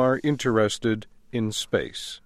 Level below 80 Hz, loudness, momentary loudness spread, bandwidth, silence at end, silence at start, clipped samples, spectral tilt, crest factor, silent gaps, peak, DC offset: -54 dBFS; -26 LUFS; 9 LU; 15.5 kHz; 0.1 s; 0 s; under 0.1%; -5 dB/octave; 16 dB; none; -8 dBFS; under 0.1%